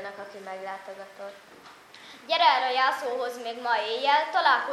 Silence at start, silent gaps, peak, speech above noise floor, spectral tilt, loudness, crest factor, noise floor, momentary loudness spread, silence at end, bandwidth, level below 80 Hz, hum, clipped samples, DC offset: 0 s; none; -6 dBFS; 22 dB; -1.5 dB/octave; -25 LUFS; 22 dB; -49 dBFS; 21 LU; 0 s; 14 kHz; -82 dBFS; none; under 0.1%; under 0.1%